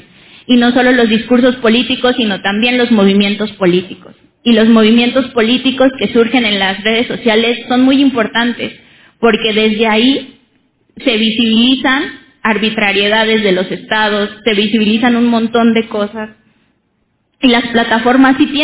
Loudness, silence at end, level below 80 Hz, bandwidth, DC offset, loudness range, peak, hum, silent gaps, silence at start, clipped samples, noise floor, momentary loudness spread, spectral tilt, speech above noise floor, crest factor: -11 LUFS; 0 s; -48 dBFS; 4 kHz; under 0.1%; 3 LU; 0 dBFS; none; none; 0.5 s; under 0.1%; -61 dBFS; 7 LU; -9 dB/octave; 50 dB; 12 dB